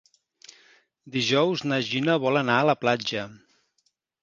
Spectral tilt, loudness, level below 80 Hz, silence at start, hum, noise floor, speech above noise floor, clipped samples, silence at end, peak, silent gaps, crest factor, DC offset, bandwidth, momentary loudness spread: -5 dB/octave; -24 LUFS; -70 dBFS; 1.05 s; none; -72 dBFS; 49 dB; under 0.1%; 0.85 s; -6 dBFS; none; 20 dB; under 0.1%; 7.6 kHz; 10 LU